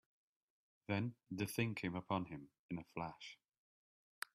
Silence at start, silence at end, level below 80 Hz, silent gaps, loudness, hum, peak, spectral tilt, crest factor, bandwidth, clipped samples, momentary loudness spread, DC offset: 0.9 s; 1 s; -76 dBFS; 2.59-2.69 s; -44 LUFS; none; -24 dBFS; -5.5 dB/octave; 22 dB; 14 kHz; under 0.1%; 15 LU; under 0.1%